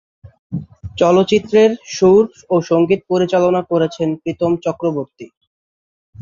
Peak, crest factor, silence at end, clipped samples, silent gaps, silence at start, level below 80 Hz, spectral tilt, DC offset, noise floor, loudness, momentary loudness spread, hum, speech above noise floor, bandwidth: -2 dBFS; 16 dB; 0 s; under 0.1%; 0.39-0.50 s, 5.37-5.41 s, 5.47-6.13 s; 0.25 s; -50 dBFS; -6.5 dB/octave; under 0.1%; under -90 dBFS; -15 LUFS; 16 LU; none; over 75 dB; 7.4 kHz